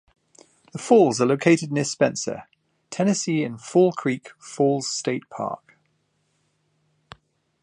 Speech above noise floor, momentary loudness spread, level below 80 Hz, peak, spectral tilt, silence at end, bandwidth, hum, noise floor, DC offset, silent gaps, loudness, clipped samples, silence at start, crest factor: 48 dB; 18 LU; -70 dBFS; -4 dBFS; -5 dB/octave; 2.05 s; 11 kHz; none; -70 dBFS; under 0.1%; none; -22 LUFS; under 0.1%; 0.75 s; 20 dB